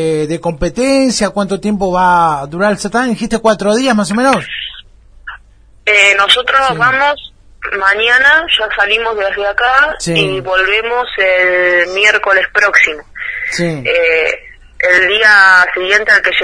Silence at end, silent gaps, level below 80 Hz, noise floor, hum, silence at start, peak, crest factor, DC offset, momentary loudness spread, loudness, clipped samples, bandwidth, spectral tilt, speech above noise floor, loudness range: 0 s; none; -38 dBFS; -43 dBFS; none; 0 s; 0 dBFS; 12 dB; under 0.1%; 11 LU; -10 LUFS; 0.2%; 11 kHz; -3.5 dB/octave; 31 dB; 4 LU